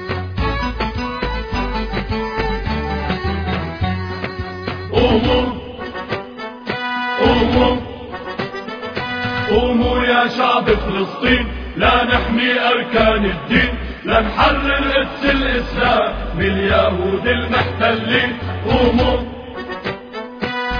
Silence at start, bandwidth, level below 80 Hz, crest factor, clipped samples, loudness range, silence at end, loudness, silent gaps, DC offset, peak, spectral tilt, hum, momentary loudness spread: 0 s; 5.4 kHz; -28 dBFS; 16 dB; under 0.1%; 6 LU; 0 s; -17 LUFS; none; under 0.1%; 0 dBFS; -7 dB/octave; none; 11 LU